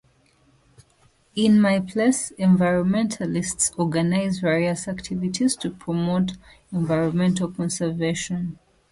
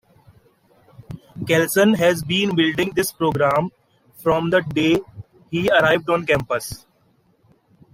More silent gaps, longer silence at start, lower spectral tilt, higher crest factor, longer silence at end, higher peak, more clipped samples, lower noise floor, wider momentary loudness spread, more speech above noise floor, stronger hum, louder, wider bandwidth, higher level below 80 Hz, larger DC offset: neither; first, 1.35 s vs 1 s; about the same, -5.5 dB/octave vs -5 dB/octave; about the same, 16 dB vs 18 dB; second, 0.35 s vs 1.15 s; about the same, -6 dBFS vs -4 dBFS; neither; about the same, -60 dBFS vs -60 dBFS; second, 10 LU vs 16 LU; second, 38 dB vs 42 dB; neither; second, -22 LUFS vs -19 LUFS; second, 11.5 kHz vs 16 kHz; about the same, -54 dBFS vs -52 dBFS; neither